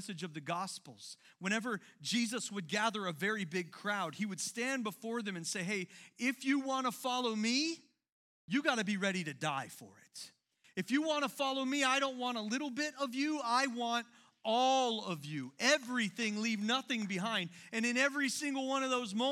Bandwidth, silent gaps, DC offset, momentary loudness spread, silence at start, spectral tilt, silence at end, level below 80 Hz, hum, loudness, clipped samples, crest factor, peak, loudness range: 16.5 kHz; 8.09-8.48 s; under 0.1%; 12 LU; 0 s; -3 dB/octave; 0 s; under -90 dBFS; none; -35 LUFS; under 0.1%; 22 dB; -14 dBFS; 4 LU